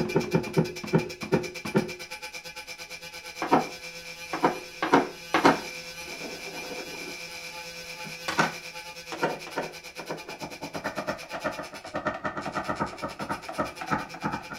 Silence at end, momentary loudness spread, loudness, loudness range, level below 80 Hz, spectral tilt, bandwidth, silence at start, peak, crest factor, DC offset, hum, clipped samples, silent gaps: 0 s; 13 LU; -30 LUFS; 7 LU; -58 dBFS; -4.5 dB/octave; 16 kHz; 0 s; -4 dBFS; 26 dB; under 0.1%; none; under 0.1%; none